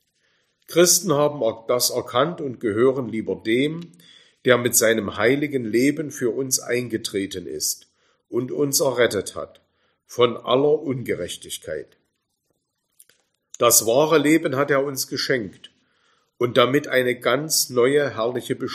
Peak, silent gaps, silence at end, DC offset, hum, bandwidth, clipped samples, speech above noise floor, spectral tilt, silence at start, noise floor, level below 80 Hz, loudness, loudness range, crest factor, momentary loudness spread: 0 dBFS; none; 0 s; under 0.1%; none; 15.5 kHz; under 0.1%; 53 dB; -3 dB/octave; 0.7 s; -74 dBFS; -64 dBFS; -21 LUFS; 4 LU; 22 dB; 12 LU